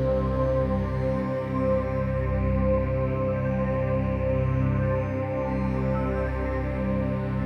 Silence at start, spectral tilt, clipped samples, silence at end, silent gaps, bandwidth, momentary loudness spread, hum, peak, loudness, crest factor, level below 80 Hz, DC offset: 0 s; -10 dB/octave; under 0.1%; 0 s; none; 6 kHz; 3 LU; none; -12 dBFS; -26 LUFS; 14 dB; -34 dBFS; under 0.1%